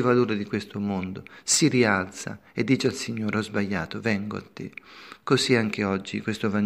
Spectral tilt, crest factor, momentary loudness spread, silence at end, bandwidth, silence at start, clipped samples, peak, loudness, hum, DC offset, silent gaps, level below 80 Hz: -4.5 dB/octave; 20 dB; 16 LU; 0 s; 15.5 kHz; 0 s; under 0.1%; -6 dBFS; -25 LUFS; none; under 0.1%; none; -62 dBFS